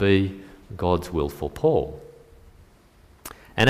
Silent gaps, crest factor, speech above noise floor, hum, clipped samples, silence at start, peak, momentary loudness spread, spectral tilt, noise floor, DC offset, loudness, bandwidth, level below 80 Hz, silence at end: none; 20 dB; 31 dB; none; under 0.1%; 0 s; -6 dBFS; 20 LU; -6.5 dB/octave; -54 dBFS; under 0.1%; -25 LUFS; 15.5 kHz; -44 dBFS; 0 s